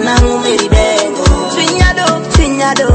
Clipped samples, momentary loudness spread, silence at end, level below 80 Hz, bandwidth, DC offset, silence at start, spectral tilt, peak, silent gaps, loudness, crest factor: 0.4%; 2 LU; 0 s; -16 dBFS; 8.8 kHz; under 0.1%; 0 s; -4.5 dB/octave; 0 dBFS; none; -11 LUFS; 10 dB